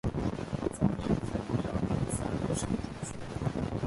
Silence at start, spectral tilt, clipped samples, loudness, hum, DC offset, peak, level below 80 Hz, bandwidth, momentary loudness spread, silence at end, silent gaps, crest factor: 0.05 s; -6.5 dB/octave; under 0.1%; -33 LUFS; none; under 0.1%; -14 dBFS; -44 dBFS; 11.5 kHz; 5 LU; 0 s; none; 18 dB